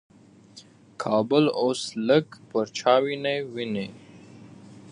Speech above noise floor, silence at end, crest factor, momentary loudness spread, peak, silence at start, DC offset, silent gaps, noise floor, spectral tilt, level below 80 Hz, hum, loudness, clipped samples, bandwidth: 27 dB; 0 s; 20 dB; 9 LU; -6 dBFS; 0.55 s; under 0.1%; none; -51 dBFS; -5 dB/octave; -72 dBFS; none; -25 LUFS; under 0.1%; 11 kHz